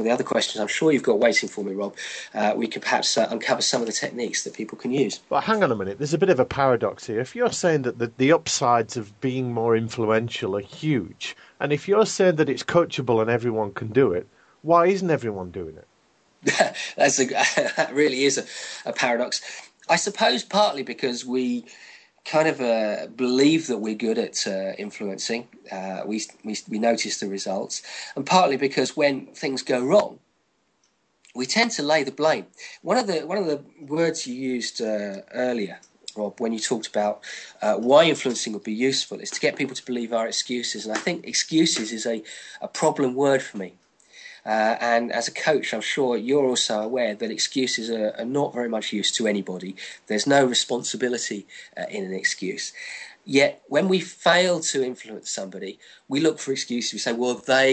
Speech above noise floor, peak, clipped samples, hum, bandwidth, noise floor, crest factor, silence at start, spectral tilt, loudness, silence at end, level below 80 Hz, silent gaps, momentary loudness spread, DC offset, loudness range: 45 dB; -2 dBFS; under 0.1%; none; 9.2 kHz; -69 dBFS; 22 dB; 0 s; -3.5 dB/octave; -23 LUFS; 0 s; -66 dBFS; none; 12 LU; under 0.1%; 3 LU